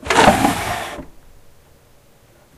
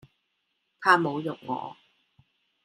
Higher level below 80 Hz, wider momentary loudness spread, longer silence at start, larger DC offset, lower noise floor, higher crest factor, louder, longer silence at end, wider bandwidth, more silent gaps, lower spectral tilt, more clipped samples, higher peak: first, -38 dBFS vs -78 dBFS; first, 19 LU vs 13 LU; second, 0 s vs 0.8 s; neither; second, -50 dBFS vs -77 dBFS; second, 20 dB vs 26 dB; first, -16 LUFS vs -26 LUFS; first, 1.45 s vs 0.95 s; first, 15.5 kHz vs 14 kHz; neither; second, -4 dB/octave vs -5.5 dB/octave; neither; first, 0 dBFS vs -4 dBFS